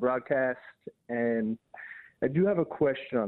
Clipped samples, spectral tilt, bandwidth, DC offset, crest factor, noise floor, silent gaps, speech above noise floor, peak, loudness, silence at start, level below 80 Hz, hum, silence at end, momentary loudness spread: under 0.1%; -10.5 dB/octave; 4.2 kHz; under 0.1%; 16 dB; -47 dBFS; none; 18 dB; -14 dBFS; -29 LUFS; 0 s; -68 dBFS; none; 0 s; 18 LU